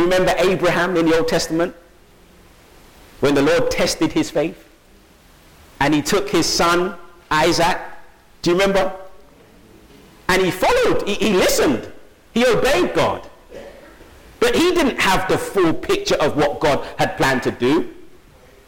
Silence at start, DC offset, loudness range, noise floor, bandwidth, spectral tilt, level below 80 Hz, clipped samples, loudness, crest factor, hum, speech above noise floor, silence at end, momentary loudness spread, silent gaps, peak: 0 s; under 0.1%; 3 LU; -49 dBFS; 17.5 kHz; -4 dB/octave; -40 dBFS; under 0.1%; -18 LUFS; 14 dB; none; 32 dB; 0.6 s; 10 LU; none; -6 dBFS